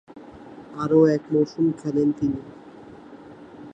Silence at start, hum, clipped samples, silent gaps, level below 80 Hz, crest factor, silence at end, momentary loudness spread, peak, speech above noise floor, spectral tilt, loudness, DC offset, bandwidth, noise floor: 0.15 s; none; under 0.1%; none; -58 dBFS; 18 dB; 0.05 s; 26 LU; -6 dBFS; 23 dB; -8.5 dB/octave; -22 LUFS; under 0.1%; 8.6 kHz; -44 dBFS